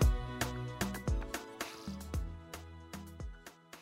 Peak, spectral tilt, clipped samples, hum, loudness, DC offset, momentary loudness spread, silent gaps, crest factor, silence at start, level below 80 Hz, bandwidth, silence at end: -18 dBFS; -5 dB/octave; under 0.1%; none; -41 LUFS; under 0.1%; 12 LU; none; 20 dB; 0 s; -40 dBFS; 16 kHz; 0 s